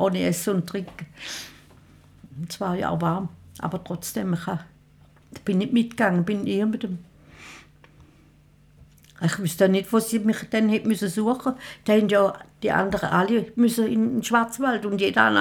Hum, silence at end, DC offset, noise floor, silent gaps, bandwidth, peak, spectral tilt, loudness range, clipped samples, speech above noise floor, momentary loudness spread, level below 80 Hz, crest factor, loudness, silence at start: none; 0 s; under 0.1%; -55 dBFS; none; 18.5 kHz; -2 dBFS; -5.5 dB/octave; 8 LU; under 0.1%; 32 dB; 14 LU; -58 dBFS; 22 dB; -24 LUFS; 0 s